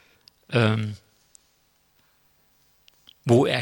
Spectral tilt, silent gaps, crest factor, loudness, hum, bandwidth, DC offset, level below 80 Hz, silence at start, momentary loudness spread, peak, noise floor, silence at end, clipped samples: -6.5 dB/octave; none; 20 dB; -23 LUFS; none; 17 kHz; under 0.1%; -66 dBFS; 0.5 s; 15 LU; -6 dBFS; -65 dBFS; 0 s; under 0.1%